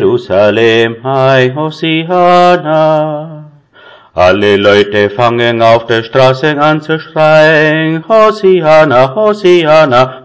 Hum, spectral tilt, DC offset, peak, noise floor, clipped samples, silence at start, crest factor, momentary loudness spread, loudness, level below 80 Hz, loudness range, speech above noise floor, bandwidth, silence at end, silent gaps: none; -6.5 dB/octave; 0.6%; 0 dBFS; -38 dBFS; 2%; 0 s; 8 dB; 7 LU; -8 LUFS; -42 dBFS; 3 LU; 31 dB; 8 kHz; 0.05 s; none